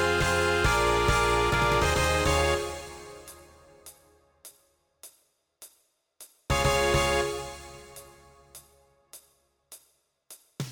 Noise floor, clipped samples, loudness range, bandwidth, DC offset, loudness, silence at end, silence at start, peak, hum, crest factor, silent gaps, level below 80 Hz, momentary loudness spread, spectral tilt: -69 dBFS; under 0.1%; 19 LU; 19 kHz; under 0.1%; -25 LUFS; 0 s; 0 s; -12 dBFS; none; 18 dB; none; -40 dBFS; 22 LU; -4 dB/octave